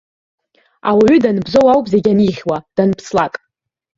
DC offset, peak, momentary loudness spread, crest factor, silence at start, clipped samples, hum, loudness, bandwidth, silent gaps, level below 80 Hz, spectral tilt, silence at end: under 0.1%; 0 dBFS; 11 LU; 14 dB; 0.85 s; under 0.1%; none; -14 LUFS; 7.8 kHz; none; -50 dBFS; -7 dB/octave; 0.7 s